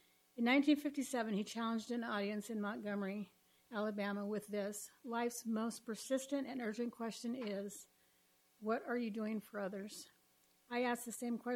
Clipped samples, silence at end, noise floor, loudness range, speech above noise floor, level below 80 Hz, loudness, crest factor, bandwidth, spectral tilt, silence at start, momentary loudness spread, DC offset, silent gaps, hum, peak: under 0.1%; 0 s; -74 dBFS; 5 LU; 34 dB; -86 dBFS; -41 LUFS; 20 dB; 16.5 kHz; -4.5 dB/octave; 0.35 s; 11 LU; under 0.1%; none; none; -22 dBFS